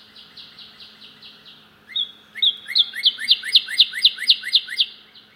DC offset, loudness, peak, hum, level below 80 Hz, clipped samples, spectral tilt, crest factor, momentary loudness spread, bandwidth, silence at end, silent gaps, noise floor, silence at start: under 0.1%; -17 LUFS; 0 dBFS; none; -74 dBFS; under 0.1%; 2 dB/octave; 22 dB; 11 LU; 16 kHz; 0.4 s; none; -48 dBFS; 0.15 s